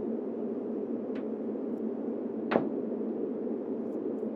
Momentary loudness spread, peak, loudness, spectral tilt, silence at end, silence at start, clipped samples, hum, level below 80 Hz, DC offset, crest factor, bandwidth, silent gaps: 5 LU; -8 dBFS; -34 LUFS; -9.5 dB/octave; 0 s; 0 s; under 0.1%; none; -80 dBFS; under 0.1%; 26 dB; 4.9 kHz; none